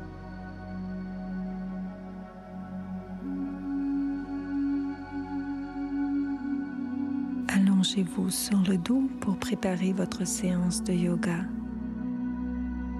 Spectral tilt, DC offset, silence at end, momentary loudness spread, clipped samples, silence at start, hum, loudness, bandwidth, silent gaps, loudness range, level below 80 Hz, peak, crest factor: -5.5 dB/octave; under 0.1%; 0 s; 13 LU; under 0.1%; 0 s; none; -30 LUFS; 13.5 kHz; none; 8 LU; -48 dBFS; -12 dBFS; 18 dB